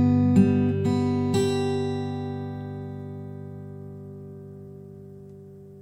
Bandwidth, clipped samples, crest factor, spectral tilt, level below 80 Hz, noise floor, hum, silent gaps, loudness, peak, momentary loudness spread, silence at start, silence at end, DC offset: 12.5 kHz; under 0.1%; 20 dB; -7.5 dB/octave; -60 dBFS; -45 dBFS; none; none; -24 LUFS; -6 dBFS; 25 LU; 0 s; 0 s; under 0.1%